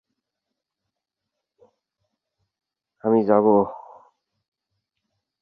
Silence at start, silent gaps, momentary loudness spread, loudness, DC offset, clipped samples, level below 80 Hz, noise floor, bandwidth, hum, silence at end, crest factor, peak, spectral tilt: 3.05 s; none; 12 LU; -20 LUFS; under 0.1%; under 0.1%; -68 dBFS; -84 dBFS; 4.8 kHz; none; 1.65 s; 22 dB; -4 dBFS; -11.5 dB/octave